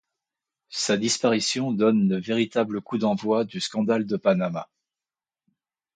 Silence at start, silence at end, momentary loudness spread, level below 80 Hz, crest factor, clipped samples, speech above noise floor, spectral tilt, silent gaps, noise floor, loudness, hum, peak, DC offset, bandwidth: 0.7 s; 1.3 s; 6 LU; -68 dBFS; 18 dB; under 0.1%; over 66 dB; -4.5 dB/octave; none; under -90 dBFS; -24 LUFS; none; -8 dBFS; under 0.1%; 9.6 kHz